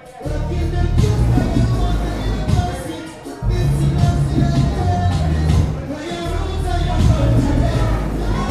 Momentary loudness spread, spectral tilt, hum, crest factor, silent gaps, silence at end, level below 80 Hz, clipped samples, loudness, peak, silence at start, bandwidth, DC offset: 9 LU; -7 dB/octave; none; 16 dB; none; 0 s; -22 dBFS; under 0.1%; -19 LUFS; 0 dBFS; 0 s; 13.5 kHz; under 0.1%